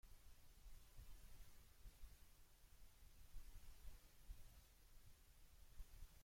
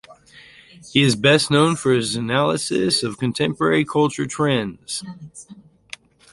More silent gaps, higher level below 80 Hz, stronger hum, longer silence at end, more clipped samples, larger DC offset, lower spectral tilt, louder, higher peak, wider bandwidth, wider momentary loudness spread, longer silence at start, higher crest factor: neither; second, -64 dBFS vs -56 dBFS; neither; second, 0 s vs 0.75 s; neither; neither; about the same, -3.5 dB/octave vs -4.5 dB/octave; second, -67 LUFS vs -19 LUFS; second, -44 dBFS vs -2 dBFS; first, 16.5 kHz vs 11.5 kHz; second, 3 LU vs 23 LU; about the same, 0.05 s vs 0.1 s; about the same, 16 dB vs 20 dB